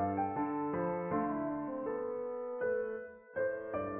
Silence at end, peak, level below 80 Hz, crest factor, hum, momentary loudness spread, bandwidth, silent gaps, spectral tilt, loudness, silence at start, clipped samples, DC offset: 0 s; -22 dBFS; -66 dBFS; 14 dB; none; 5 LU; 3.2 kHz; none; -3 dB/octave; -37 LUFS; 0 s; under 0.1%; under 0.1%